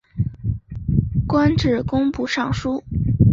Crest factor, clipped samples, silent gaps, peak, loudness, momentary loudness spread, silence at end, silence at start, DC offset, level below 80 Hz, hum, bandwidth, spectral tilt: 16 dB; under 0.1%; none; -2 dBFS; -21 LUFS; 9 LU; 0 s; 0.15 s; under 0.1%; -32 dBFS; none; 7.6 kHz; -7.5 dB/octave